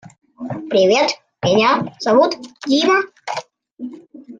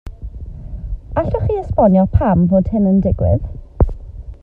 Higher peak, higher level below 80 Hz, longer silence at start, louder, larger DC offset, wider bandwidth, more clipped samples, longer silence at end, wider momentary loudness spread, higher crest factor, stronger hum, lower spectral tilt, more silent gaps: about the same, -2 dBFS vs 0 dBFS; second, -60 dBFS vs -26 dBFS; first, 0.4 s vs 0.05 s; about the same, -17 LUFS vs -16 LUFS; neither; first, 9.2 kHz vs 3.1 kHz; neither; about the same, 0.05 s vs 0.1 s; about the same, 19 LU vs 20 LU; about the same, 16 dB vs 16 dB; neither; second, -4.5 dB/octave vs -12 dB/octave; first, 3.71-3.77 s vs none